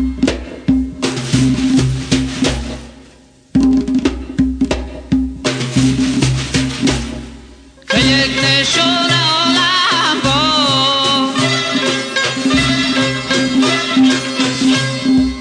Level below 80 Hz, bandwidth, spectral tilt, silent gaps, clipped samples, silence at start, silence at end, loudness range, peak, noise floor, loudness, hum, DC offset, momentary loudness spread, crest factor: -32 dBFS; 10 kHz; -4 dB/octave; none; under 0.1%; 0 s; 0 s; 6 LU; 0 dBFS; -44 dBFS; -14 LUFS; none; under 0.1%; 8 LU; 14 dB